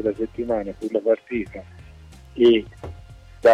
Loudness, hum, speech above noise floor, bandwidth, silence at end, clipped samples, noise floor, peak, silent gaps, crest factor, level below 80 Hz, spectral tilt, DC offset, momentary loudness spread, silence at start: -22 LUFS; none; 22 dB; 8.6 kHz; 0 s; under 0.1%; -44 dBFS; -6 dBFS; none; 16 dB; -46 dBFS; -6.5 dB/octave; under 0.1%; 22 LU; 0 s